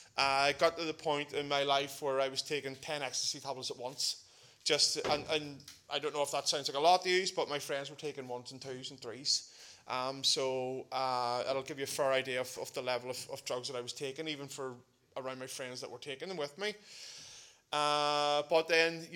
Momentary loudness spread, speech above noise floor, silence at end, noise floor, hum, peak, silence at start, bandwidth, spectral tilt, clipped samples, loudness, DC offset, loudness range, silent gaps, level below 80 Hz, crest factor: 15 LU; 21 dB; 0 s; -56 dBFS; none; -12 dBFS; 0 s; 17.5 kHz; -2 dB/octave; under 0.1%; -34 LUFS; under 0.1%; 9 LU; none; -76 dBFS; 24 dB